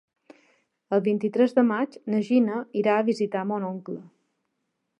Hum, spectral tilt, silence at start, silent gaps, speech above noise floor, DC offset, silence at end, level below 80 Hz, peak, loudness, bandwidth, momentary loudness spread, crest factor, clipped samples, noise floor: none; -7.5 dB/octave; 0.9 s; none; 54 dB; under 0.1%; 0.9 s; -80 dBFS; -8 dBFS; -24 LUFS; 8.8 kHz; 10 LU; 18 dB; under 0.1%; -78 dBFS